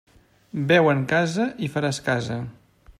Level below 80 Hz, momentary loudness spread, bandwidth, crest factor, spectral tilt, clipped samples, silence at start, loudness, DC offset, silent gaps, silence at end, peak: -58 dBFS; 14 LU; 13.5 kHz; 18 dB; -6 dB/octave; under 0.1%; 0.55 s; -22 LUFS; under 0.1%; none; 0.1 s; -4 dBFS